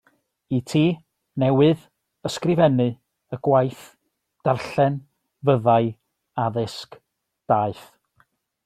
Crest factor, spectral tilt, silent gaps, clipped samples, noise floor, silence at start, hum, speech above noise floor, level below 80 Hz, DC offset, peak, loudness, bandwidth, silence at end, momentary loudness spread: 20 dB; -7.5 dB/octave; none; under 0.1%; -64 dBFS; 0.5 s; none; 44 dB; -60 dBFS; under 0.1%; -4 dBFS; -22 LUFS; 13.5 kHz; 0.85 s; 16 LU